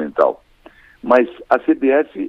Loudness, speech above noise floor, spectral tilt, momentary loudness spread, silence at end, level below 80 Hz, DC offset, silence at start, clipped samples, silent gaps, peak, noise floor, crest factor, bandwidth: -16 LUFS; 31 dB; -7 dB/octave; 10 LU; 0 s; -54 dBFS; under 0.1%; 0 s; under 0.1%; none; 0 dBFS; -47 dBFS; 16 dB; 6.4 kHz